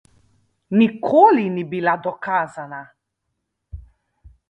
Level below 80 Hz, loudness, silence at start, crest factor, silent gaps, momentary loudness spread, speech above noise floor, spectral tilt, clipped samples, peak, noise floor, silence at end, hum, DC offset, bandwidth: -50 dBFS; -18 LUFS; 0.7 s; 20 dB; none; 18 LU; 59 dB; -8 dB/octave; under 0.1%; 0 dBFS; -77 dBFS; 0.2 s; none; under 0.1%; 8.6 kHz